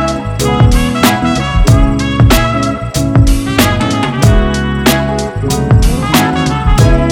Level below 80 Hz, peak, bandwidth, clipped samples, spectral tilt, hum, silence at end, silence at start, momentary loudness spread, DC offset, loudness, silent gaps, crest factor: -16 dBFS; 0 dBFS; 19.5 kHz; under 0.1%; -5.5 dB/octave; none; 0 s; 0 s; 5 LU; under 0.1%; -11 LUFS; none; 10 dB